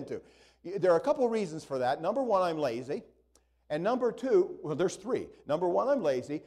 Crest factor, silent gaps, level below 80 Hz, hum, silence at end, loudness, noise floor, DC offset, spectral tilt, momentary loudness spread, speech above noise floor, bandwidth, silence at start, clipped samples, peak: 16 dB; none; -68 dBFS; none; 0.05 s; -30 LUFS; -68 dBFS; under 0.1%; -6 dB/octave; 11 LU; 38 dB; 12 kHz; 0 s; under 0.1%; -14 dBFS